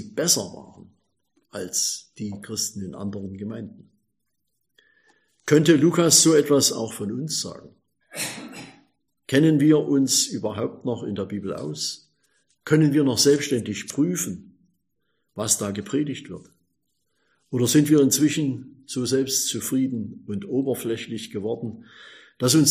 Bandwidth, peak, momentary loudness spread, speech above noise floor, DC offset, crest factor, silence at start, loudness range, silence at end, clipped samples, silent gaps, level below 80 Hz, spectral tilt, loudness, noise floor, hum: 15.5 kHz; -2 dBFS; 18 LU; 56 dB; under 0.1%; 22 dB; 0 s; 10 LU; 0 s; under 0.1%; none; -66 dBFS; -4 dB/octave; -22 LUFS; -79 dBFS; none